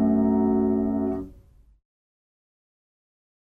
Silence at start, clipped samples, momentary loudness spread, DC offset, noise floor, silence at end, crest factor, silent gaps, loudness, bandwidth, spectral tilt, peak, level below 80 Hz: 0 s; under 0.1%; 12 LU; under 0.1%; -53 dBFS; 2.2 s; 14 dB; none; -23 LUFS; 2.3 kHz; -12 dB/octave; -12 dBFS; -50 dBFS